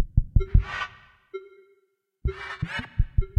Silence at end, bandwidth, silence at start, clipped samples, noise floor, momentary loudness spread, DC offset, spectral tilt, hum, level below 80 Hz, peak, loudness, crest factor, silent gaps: 0.1 s; 7 kHz; 0 s; under 0.1%; -70 dBFS; 18 LU; under 0.1%; -7.5 dB/octave; none; -28 dBFS; -6 dBFS; -28 LUFS; 20 dB; none